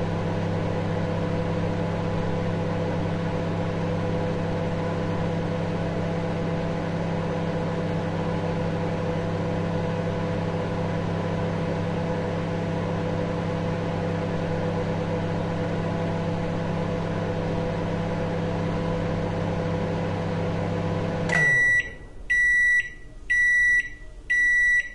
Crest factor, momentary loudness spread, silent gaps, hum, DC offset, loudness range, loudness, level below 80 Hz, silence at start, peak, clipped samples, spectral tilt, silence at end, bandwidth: 14 dB; 9 LU; none; none; under 0.1%; 7 LU; -25 LUFS; -42 dBFS; 0 s; -12 dBFS; under 0.1%; -6.5 dB/octave; 0 s; 10.5 kHz